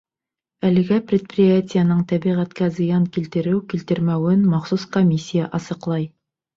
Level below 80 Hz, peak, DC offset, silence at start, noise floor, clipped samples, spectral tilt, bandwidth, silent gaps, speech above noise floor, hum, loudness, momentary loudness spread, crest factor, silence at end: -58 dBFS; -6 dBFS; under 0.1%; 0.65 s; -88 dBFS; under 0.1%; -8 dB/octave; 7.4 kHz; none; 69 dB; none; -20 LUFS; 8 LU; 14 dB; 0.5 s